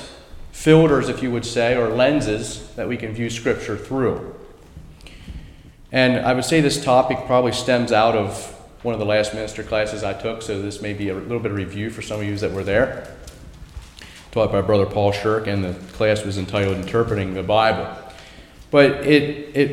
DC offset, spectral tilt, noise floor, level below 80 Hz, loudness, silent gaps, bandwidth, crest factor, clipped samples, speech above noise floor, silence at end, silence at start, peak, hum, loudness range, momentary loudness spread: under 0.1%; -5.5 dB/octave; -43 dBFS; -42 dBFS; -20 LUFS; none; 16 kHz; 20 dB; under 0.1%; 23 dB; 0 s; 0 s; 0 dBFS; none; 7 LU; 20 LU